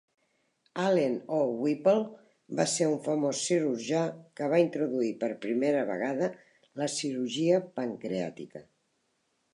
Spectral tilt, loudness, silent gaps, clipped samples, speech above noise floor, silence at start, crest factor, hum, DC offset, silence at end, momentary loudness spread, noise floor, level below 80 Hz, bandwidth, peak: -5 dB/octave; -29 LUFS; none; under 0.1%; 47 dB; 0.75 s; 18 dB; none; under 0.1%; 0.9 s; 10 LU; -75 dBFS; -80 dBFS; 11.5 kHz; -12 dBFS